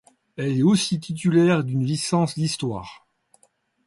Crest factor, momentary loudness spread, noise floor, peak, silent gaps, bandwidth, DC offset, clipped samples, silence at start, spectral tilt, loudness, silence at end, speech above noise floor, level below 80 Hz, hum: 16 dB; 12 LU; -64 dBFS; -8 dBFS; none; 11.5 kHz; under 0.1%; under 0.1%; 0.4 s; -5.5 dB/octave; -22 LUFS; 0.9 s; 43 dB; -60 dBFS; none